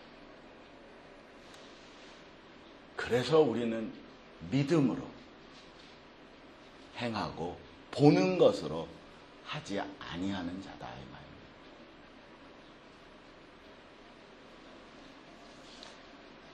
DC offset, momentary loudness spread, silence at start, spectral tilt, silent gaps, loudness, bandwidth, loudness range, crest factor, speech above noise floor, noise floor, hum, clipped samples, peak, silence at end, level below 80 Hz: under 0.1%; 27 LU; 0 s; -6.5 dB/octave; none; -32 LUFS; 11.5 kHz; 22 LU; 28 dB; 24 dB; -55 dBFS; none; under 0.1%; -8 dBFS; 0 s; -64 dBFS